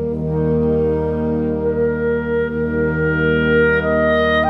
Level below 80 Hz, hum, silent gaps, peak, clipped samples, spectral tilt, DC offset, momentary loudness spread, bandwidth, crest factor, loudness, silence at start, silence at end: -32 dBFS; none; none; -4 dBFS; under 0.1%; -9 dB/octave; under 0.1%; 5 LU; 5.2 kHz; 12 dB; -17 LUFS; 0 s; 0 s